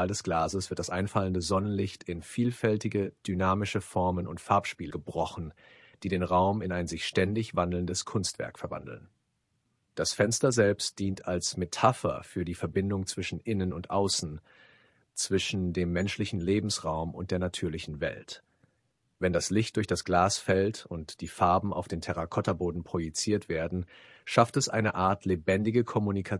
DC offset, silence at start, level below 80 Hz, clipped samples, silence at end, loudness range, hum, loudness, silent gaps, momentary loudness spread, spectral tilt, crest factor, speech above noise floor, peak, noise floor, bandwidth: under 0.1%; 0 s; -58 dBFS; under 0.1%; 0 s; 4 LU; none; -30 LUFS; none; 11 LU; -5 dB/octave; 24 dB; 47 dB; -6 dBFS; -76 dBFS; 12 kHz